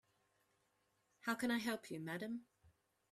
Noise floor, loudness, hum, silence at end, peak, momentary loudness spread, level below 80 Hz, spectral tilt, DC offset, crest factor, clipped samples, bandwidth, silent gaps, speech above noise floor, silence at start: -82 dBFS; -43 LUFS; none; 0.45 s; -26 dBFS; 9 LU; -84 dBFS; -4.5 dB/octave; under 0.1%; 20 dB; under 0.1%; 14.5 kHz; none; 39 dB; 1.25 s